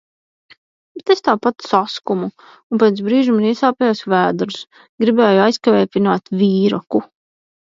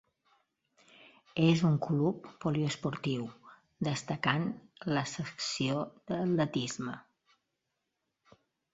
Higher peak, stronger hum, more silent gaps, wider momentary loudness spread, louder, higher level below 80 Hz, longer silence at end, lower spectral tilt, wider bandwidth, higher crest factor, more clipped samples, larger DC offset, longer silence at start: first, 0 dBFS vs -12 dBFS; neither; first, 2.63-2.70 s, 4.89-4.98 s vs none; about the same, 9 LU vs 11 LU; first, -16 LUFS vs -33 LUFS; about the same, -64 dBFS vs -68 dBFS; second, 0.6 s vs 1.75 s; about the same, -6.5 dB/octave vs -5.5 dB/octave; about the same, 7.6 kHz vs 8 kHz; second, 16 dB vs 22 dB; neither; neither; second, 0.95 s vs 1.35 s